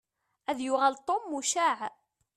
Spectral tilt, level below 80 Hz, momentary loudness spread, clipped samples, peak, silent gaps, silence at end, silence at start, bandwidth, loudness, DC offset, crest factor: -0.5 dB/octave; -78 dBFS; 10 LU; under 0.1%; -12 dBFS; none; 0.45 s; 0.5 s; 14 kHz; -29 LUFS; under 0.1%; 20 dB